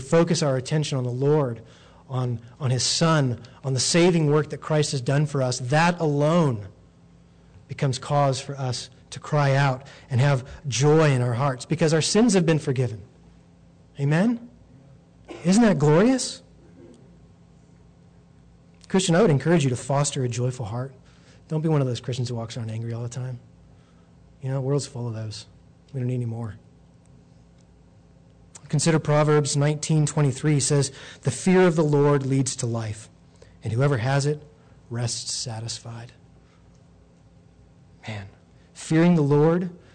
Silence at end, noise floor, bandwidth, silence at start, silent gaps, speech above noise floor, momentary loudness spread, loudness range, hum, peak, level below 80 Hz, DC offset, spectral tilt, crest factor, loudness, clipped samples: 0.15 s; -53 dBFS; 9.4 kHz; 0 s; none; 31 dB; 15 LU; 10 LU; none; -12 dBFS; -56 dBFS; under 0.1%; -5.5 dB/octave; 12 dB; -23 LUFS; under 0.1%